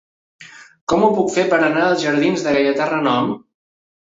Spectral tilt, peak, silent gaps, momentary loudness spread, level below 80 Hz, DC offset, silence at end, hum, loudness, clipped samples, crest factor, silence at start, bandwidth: -5 dB/octave; -4 dBFS; 0.81-0.87 s; 6 LU; -54 dBFS; under 0.1%; 0.75 s; none; -17 LUFS; under 0.1%; 16 dB; 0.4 s; 8 kHz